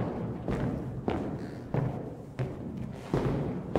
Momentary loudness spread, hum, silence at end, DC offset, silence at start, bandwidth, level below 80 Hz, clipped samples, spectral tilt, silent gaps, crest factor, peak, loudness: 8 LU; none; 0 s; under 0.1%; 0 s; 11 kHz; -48 dBFS; under 0.1%; -8.5 dB/octave; none; 22 dB; -12 dBFS; -34 LUFS